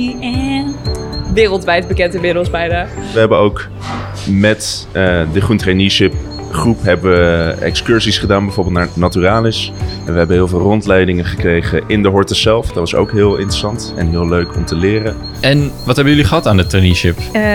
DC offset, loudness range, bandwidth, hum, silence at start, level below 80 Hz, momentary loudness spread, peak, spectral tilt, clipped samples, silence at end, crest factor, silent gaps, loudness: 0.1%; 2 LU; 18 kHz; none; 0 s; -28 dBFS; 7 LU; 0 dBFS; -5.5 dB/octave; under 0.1%; 0 s; 12 dB; none; -13 LUFS